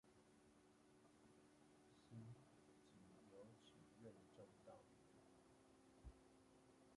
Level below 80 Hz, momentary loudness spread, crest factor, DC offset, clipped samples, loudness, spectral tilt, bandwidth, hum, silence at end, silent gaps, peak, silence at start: -78 dBFS; 6 LU; 20 dB; under 0.1%; under 0.1%; -66 LUFS; -6 dB/octave; 11 kHz; none; 0 s; none; -48 dBFS; 0.05 s